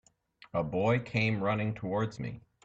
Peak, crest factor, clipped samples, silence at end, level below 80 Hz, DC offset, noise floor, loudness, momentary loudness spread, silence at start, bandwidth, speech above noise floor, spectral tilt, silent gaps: -16 dBFS; 16 dB; under 0.1%; 0.25 s; -60 dBFS; under 0.1%; -61 dBFS; -32 LUFS; 8 LU; 0.55 s; 7.8 kHz; 30 dB; -7.5 dB/octave; none